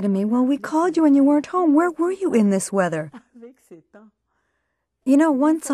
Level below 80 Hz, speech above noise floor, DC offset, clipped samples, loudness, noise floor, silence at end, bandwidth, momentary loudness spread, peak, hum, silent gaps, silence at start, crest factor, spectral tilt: -68 dBFS; 56 dB; under 0.1%; under 0.1%; -19 LUFS; -74 dBFS; 0 s; 13.5 kHz; 7 LU; -6 dBFS; none; none; 0 s; 14 dB; -6.5 dB/octave